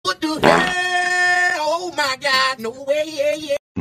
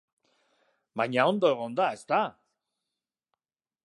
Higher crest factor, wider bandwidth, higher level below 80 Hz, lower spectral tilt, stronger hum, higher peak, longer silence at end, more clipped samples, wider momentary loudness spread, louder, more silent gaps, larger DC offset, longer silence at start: about the same, 20 dB vs 22 dB; first, 15.5 kHz vs 11.5 kHz; first, -52 dBFS vs -84 dBFS; second, -3 dB/octave vs -5.5 dB/octave; neither; first, 0 dBFS vs -8 dBFS; second, 0 s vs 1.55 s; neither; about the same, 8 LU vs 9 LU; first, -18 LUFS vs -27 LUFS; first, 3.59-3.75 s vs none; neither; second, 0.05 s vs 0.95 s